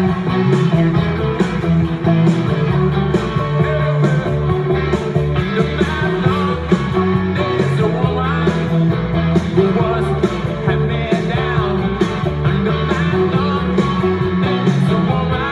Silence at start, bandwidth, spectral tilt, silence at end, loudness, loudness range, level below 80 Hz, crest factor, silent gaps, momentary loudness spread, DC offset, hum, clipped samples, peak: 0 s; 10 kHz; -8 dB/octave; 0 s; -16 LUFS; 1 LU; -32 dBFS; 14 dB; none; 3 LU; under 0.1%; none; under 0.1%; -2 dBFS